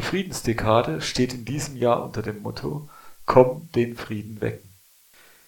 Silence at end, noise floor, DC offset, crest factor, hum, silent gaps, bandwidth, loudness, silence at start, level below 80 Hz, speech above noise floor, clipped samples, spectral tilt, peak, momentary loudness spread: 0.8 s; -55 dBFS; under 0.1%; 24 dB; none; none; 18 kHz; -24 LUFS; 0 s; -48 dBFS; 31 dB; under 0.1%; -5.5 dB/octave; -2 dBFS; 14 LU